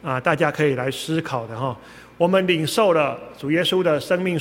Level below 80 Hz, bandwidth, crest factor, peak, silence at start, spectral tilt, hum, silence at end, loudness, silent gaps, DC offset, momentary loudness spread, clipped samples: -58 dBFS; 17 kHz; 18 dB; -2 dBFS; 0.05 s; -5.5 dB/octave; none; 0 s; -21 LUFS; none; under 0.1%; 10 LU; under 0.1%